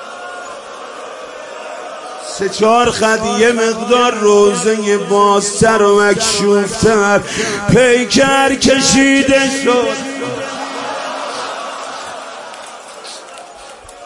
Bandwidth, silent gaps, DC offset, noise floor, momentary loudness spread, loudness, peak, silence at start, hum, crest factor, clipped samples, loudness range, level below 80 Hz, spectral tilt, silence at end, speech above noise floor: 11.5 kHz; none; under 0.1%; -34 dBFS; 19 LU; -12 LUFS; 0 dBFS; 0 s; none; 14 dB; under 0.1%; 12 LU; -44 dBFS; -3.5 dB/octave; 0 s; 23 dB